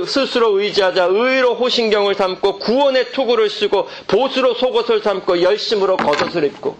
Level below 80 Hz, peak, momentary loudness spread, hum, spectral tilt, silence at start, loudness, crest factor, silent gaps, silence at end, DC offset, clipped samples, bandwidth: -54 dBFS; -4 dBFS; 3 LU; none; -4 dB/octave; 0 s; -16 LUFS; 12 dB; none; 0.05 s; under 0.1%; under 0.1%; 8.8 kHz